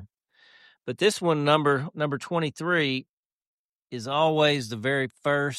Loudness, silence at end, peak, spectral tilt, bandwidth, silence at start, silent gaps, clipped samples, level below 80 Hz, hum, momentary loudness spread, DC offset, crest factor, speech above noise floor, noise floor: -25 LUFS; 0 s; -6 dBFS; -5 dB/octave; 13 kHz; 0 s; 3.09-3.41 s, 3.47-3.87 s; under 0.1%; -70 dBFS; none; 11 LU; under 0.1%; 20 dB; 35 dB; -60 dBFS